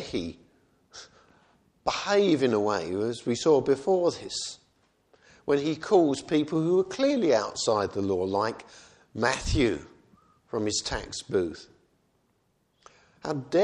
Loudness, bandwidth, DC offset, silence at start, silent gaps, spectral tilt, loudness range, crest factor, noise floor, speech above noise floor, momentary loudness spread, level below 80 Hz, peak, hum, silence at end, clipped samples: -27 LUFS; 11 kHz; under 0.1%; 0 s; none; -4.5 dB/octave; 6 LU; 20 dB; -71 dBFS; 45 dB; 14 LU; -48 dBFS; -8 dBFS; none; 0 s; under 0.1%